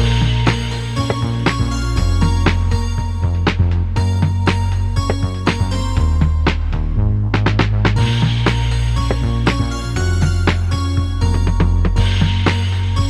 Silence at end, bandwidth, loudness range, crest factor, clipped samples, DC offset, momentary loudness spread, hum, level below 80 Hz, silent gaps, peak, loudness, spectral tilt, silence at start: 0 s; 11 kHz; 1 LU; 14 dB; under 0.1%; under 0.1%; 4 LU; none; -20 dBFS; none; 0 dBFS; -17 LUFS; -6 dB/octave; 0 s